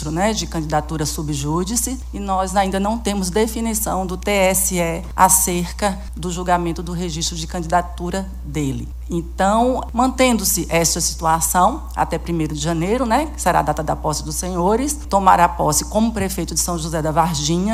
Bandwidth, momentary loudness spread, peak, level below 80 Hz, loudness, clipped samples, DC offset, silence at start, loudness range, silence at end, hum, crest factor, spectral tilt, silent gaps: 16 kHz; 9 LU; 0 dBFS; -30 dBFS; -19 LUFS; under 0.1%; under 0.1%; 0 s; 4 LU; 0 s; none; 18 dB; -4 dB/octave; none